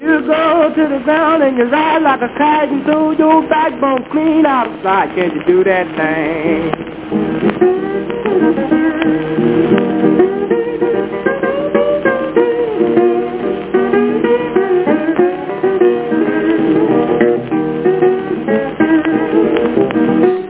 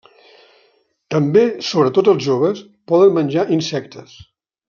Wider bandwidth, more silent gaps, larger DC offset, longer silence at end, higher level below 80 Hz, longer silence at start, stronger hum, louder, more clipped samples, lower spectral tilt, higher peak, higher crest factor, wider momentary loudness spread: second, 4 kHz vs 7.2 kHz; neither; neither; second, 0 s vs 0.65 s; first, -46 dBFS vs -62 dBFS; second, 0 s vs 1.1 s; neither; first, -13 LUFS vs -16 LUFS; neither; first, -10.5 dB/octave vs -6.5 dB/octave; about the same, 0 dBFS vs -2 dBFS; about the same, 12 dB vs 16 dB; second, 4 LU vs 11 LU